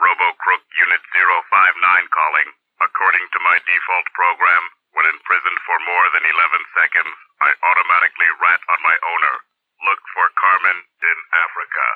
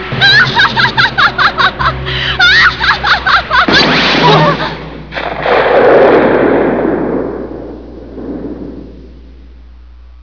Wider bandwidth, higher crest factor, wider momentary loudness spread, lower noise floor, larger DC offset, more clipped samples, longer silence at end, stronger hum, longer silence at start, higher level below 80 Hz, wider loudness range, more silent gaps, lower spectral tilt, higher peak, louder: second, 4.9 kHz vs 5.4 kHz; first, 16 dB vs 10 dB; second, 6 LU vs 18 LU; about the same, -35 dBFS vs -34 dBFS; second, under 0.1% vs 0.8%; second, under 0.1% vs 0.7%; about the same, 0 s vs 0.1 s; neither; about the same, 0 s vs 0 s; second, -88 dBFS vs -32 dBFS; second, 1 LU vs 10 LU; neither; second, -2 dB/octave vs -5 dB/octave; about the same, 0 dBFS vs 0 dBFS; second, -15 LUFS vs -8 LUFS